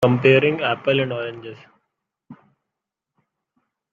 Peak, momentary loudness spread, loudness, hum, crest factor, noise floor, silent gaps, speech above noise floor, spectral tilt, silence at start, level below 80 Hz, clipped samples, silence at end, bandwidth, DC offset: -2 dBFS; 20 LU; -18 LUFS; none; 20 dB; -84 dBFS; none; 65 dB; -7.5 dB/octave; 0 s; -62 dBFS; under 0.1%; 1.6 s; 7.6 kHz; under 0.1%